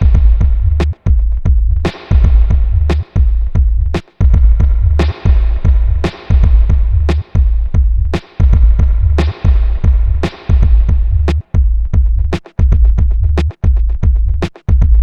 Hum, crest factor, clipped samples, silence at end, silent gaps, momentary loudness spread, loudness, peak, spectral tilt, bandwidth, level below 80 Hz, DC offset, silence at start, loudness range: none; 10 dB; 0.3%; 0 s; none; 4 LU; -13 LUFS; 0 dBFS; -8.5 dB/octave; 5.6 kHz; -10 dBFS; under 0.1%; 0 s; 1 LU